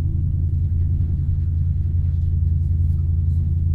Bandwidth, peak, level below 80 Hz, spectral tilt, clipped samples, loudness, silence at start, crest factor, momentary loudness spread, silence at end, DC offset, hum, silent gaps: 0.7 kHz; -10 dBFS; -24 dBFS; -12 dB/octave; under 0.1%; -21 LUFS; 0 s; 10 dB; 1 LU; 0 s; under 0.1%; none; none